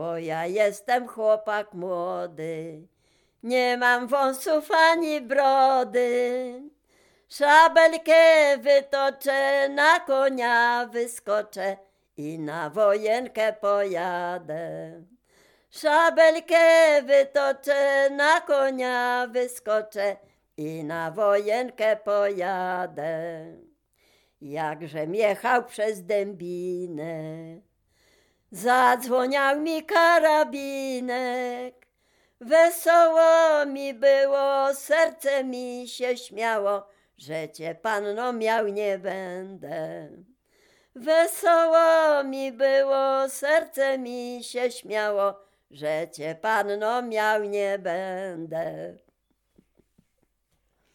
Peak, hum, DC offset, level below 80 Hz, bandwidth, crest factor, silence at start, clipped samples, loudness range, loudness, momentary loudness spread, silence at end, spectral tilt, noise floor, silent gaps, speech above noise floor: -4 dBFS; none; under 0.1%; -74 dBFS; 18 kHz; 20 dB; 0 s; under 0.1%; 9 LU; -23 LUFS; 16 LU; 2.05 s; -3.5 dB/octave; -72 dBFS; none; 49 dB